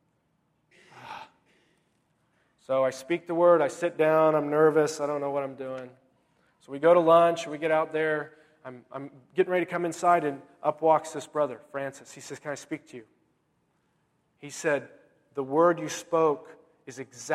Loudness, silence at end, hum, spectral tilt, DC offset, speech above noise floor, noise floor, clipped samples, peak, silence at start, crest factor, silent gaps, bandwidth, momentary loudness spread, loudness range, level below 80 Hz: -26 LUFS; 0 s; none; -5 dB/octave; under 0.1%; 46 dB; -72 dBFS; under 0.1%; -8 dBFS; 0.95 s; 20 dB; none; 13.5 kHz; 21 LU; 11 LU; -78 dBFS